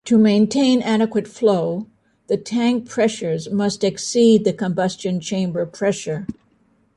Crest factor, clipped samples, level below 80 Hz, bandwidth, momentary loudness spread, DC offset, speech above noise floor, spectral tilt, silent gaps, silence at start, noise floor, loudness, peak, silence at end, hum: 16 dB; under 0.1%; -58 dBFS; 11 kHz; 11 LU; under 0.1%; 42 dB; -5.5 dB/octave; none; 0.05 s; -60 dBFS; -19 LUFS; -4 dBFS; 0.65 s; none